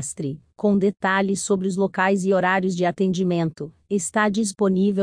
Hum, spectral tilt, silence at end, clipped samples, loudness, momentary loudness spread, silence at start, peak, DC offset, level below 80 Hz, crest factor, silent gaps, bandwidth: none; -5.5 dB/octave; 0 s; under 0.1%; -22 LUFS; 8 LU; 0 s; -6 dBFS; under 0.1%; -62 dBFS; 16 dB; none; 10.5 kHz